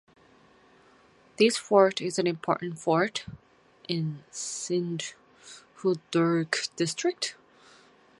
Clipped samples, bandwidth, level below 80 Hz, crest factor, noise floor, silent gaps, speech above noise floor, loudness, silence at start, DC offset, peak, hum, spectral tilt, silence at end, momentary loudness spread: under 0.1%; 11.5 kHz; -70 dBFS; 24 dB; -59 dBFS; none; 32 dB; -28 LUFS; 1.4 s; under 0.1%; -6 dBFS; none; -4.5 dB/octave; 0.85 s; 15 LU